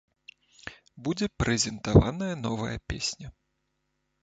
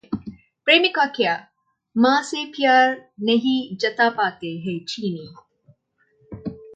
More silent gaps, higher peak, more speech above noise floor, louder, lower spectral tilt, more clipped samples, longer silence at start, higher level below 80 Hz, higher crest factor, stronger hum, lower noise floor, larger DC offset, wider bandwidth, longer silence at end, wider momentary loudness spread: neither; about the same, -4 dBFS vs -2 dBFS; first, 51 dB vs 44 dB; second, -28 LUFS vs -20 LUFS; about the same, -5 dB/octave vs -4.5 dB/octave; neither; first, 0.65 s vs 0.1 s; first, -42 dBFS vs -60 dBFS; first, 26 dB vs 20 dB; neither; first, -77 dBFS vs -64 dBFS; neither; about the same, 9.2 kHz vs 9 kHz; first, 0.9 s vs 0 s; first, 22 LU vs 16 LU